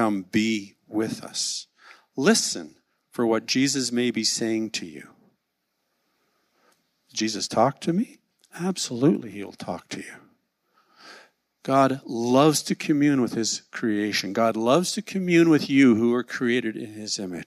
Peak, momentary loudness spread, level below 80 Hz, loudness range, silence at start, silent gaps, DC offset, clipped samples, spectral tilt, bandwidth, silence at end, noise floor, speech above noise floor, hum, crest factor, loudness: -4 dBFS; 15 LU; -72 dBFS; 8 LU; 0 s; none; under 0.1%; under 0.1%; -4 dB/octave; 14.5 kHz; 0.05 s; -77 dBFS; 54 dB; none; 20 dB; -23 LUFS